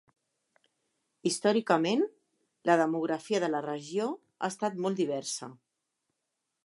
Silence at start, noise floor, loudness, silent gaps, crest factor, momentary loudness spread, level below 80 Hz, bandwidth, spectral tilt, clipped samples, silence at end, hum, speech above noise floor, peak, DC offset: 1.25 s; -84 dBFS; -30 LUFS; none; 22 dB; 10 LU; -86 dBFS; 11.5 kHz; -4.5 dB/octave; under 0.1%; 1.1 s; none; 55 dB; -10 dBFS; under 0.1%